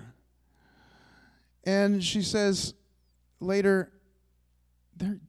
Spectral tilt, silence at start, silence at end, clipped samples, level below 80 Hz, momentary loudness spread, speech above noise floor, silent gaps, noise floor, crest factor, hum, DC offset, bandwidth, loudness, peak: -4.5 dB/octave; 0.05 s; 0.1 s; under 0.1%; -60 dBFS; 12 LU; 41 dB; none; -68 dBFS; 18 dB; 60 Hz at -60 dBFS; under 0.1%; 13 kHz; -28 LUFS; -12 dBFS